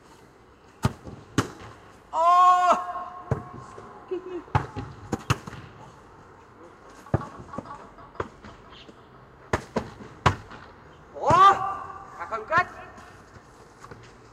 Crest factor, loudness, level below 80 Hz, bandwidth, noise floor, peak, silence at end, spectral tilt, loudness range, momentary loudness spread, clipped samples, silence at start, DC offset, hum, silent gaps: 22 dB; -25 LUFS; -50 dBFS; 14.5 kHz; -53 dBFS; -4 dBFS; 0.4 s; -5.5 dB/octave; 13 LU; 28 LU; under 0.1%; 0.85 s; under 0.1%; none; none